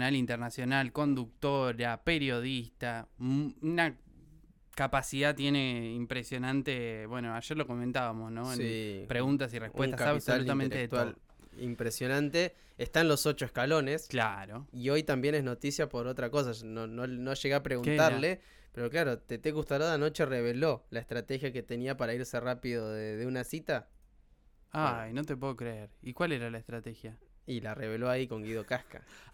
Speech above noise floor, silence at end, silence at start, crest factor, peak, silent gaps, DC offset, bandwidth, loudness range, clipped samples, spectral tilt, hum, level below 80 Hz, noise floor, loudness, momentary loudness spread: 30 dB; 0.05 s; 0 s; 18 dB; -14 dBFS; none; under 0.1%; 19 kHz; 6 LU; under 0.1%; -5.5 dB/octave; none; -58 dBFS; -63 dBFS; -33 LUFS; 10 LU